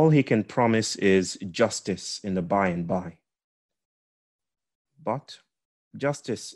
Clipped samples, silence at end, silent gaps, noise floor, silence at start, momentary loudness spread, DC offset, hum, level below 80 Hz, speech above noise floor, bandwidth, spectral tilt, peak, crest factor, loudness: under 0.1%; 0 s; 3.44-3.69 s, 3.85-4.39 s, 4.75-4.85 s, 5.65-5.91 s; under -90 dBFS; 0 s; 10 LU; under 0.1%; none; -66 dBFS; over 65 dB; 12 kHz; -5.5 dB/octave; -8 dBFS; 20 dB; -26 LUFS